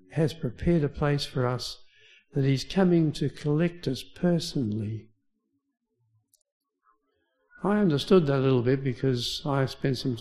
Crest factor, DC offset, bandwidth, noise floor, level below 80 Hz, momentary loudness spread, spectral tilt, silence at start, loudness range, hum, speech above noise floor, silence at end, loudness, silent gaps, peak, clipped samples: 18 dB; under 0.1%; 13 kHz; -76 dBFS; -50 dBFS; 11 LU; -7 dB/octave; 0.1 s; 8 LU; none; 50 dB; 0 s; -27 LUFS; 6.52-6.60 s; -8 dBFS; under 0.1%